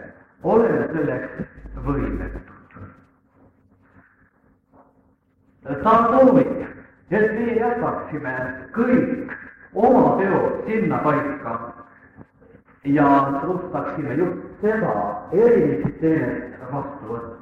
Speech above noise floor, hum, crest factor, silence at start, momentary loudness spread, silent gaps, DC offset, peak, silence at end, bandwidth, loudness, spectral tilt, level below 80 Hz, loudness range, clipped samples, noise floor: 41 dB; none; 18 dB; 0 s; 16 LU; none; under 0.1%; -4 dBFS; 0.05 s; 6.4 kHz; -21 LUFS; -9.5 dB/octave; -44 dBFS; 10 LU; under 0.1%; -60 dBFS